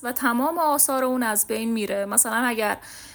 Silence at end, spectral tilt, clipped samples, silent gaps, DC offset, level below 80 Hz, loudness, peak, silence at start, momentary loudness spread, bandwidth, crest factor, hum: 0 s; -2 dB/octave; under 0.1%; none; under 0.1%; -62 dBFS; -22 LUFS; -2 dBFS; 0 s; 7 LU; over 20 kHz; 22 dB; none